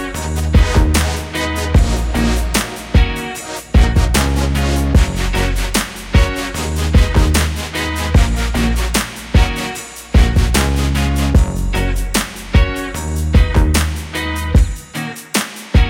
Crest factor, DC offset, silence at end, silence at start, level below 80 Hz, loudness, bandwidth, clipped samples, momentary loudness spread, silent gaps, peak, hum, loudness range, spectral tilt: 14 dB; under 0.1%; 0 s; 0 s; -16 dBFS; -16 LUFS; 17 kHz; under 0.1%; 7 LU; none; 0 dBFS; none; 1 LU; -5 dB/octave